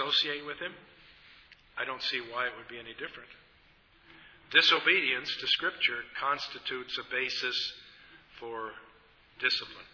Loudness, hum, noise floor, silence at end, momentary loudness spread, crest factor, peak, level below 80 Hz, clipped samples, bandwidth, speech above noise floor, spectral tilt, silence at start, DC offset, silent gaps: -29 LUFS; none; -62 dBFS; 0.05 s; 19 LU; 26 dB; -8 dBFS; -70 dBFS; under 0.1%; 5.4 kHz; 30 dB; -2 dB/octave; 0 s; under 0.1%; none